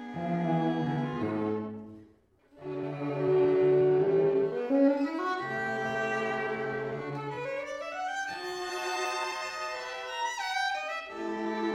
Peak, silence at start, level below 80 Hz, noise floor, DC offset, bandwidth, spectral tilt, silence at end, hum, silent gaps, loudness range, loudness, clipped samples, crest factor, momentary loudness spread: -14 dBFS; 0 s; -70 dBFS; -62 dBFS; under 0.1%; 12 kHz; -5.5 dB/octave; 0 s; none; none; 7 LU; -30 LUFS; under 0.1%; 16 dB; 11 LU